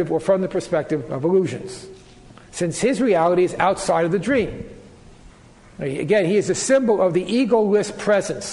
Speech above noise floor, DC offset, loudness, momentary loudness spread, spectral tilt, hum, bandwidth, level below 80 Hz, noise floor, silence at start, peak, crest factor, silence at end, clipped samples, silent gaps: 27 dB; under 0.1%; -20 LUFS; 11 LU; -5 dB/octave; none; 11.5 kHz; -50 dBFS; -47 dBFS; 0 s; -2 dBFS; 18 dB; 0 s; under 0.1%; none